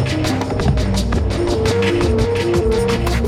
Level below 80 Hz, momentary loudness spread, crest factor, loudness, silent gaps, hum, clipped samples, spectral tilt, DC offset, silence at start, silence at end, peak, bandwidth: -24 dBFS; 2 LU; 12 dB; -17 LUFS; none; none; under 0.1%; -6 dB/octave; under 0.1%; 0 s; 0 s; -4 dBFS; 15.5 kHz